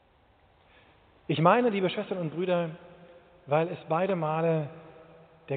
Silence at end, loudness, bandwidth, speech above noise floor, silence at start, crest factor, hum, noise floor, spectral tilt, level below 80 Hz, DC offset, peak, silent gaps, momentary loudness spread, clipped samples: 0 s; -28 LUFS; 4.5 kHz; 36 dB; 1.3 s; 22 dB; none; -63 dBFS; -5.5 dB/octave; -70 dBFS; under 0.1%; -8 dBFS; none; 16 LU; under 0.1%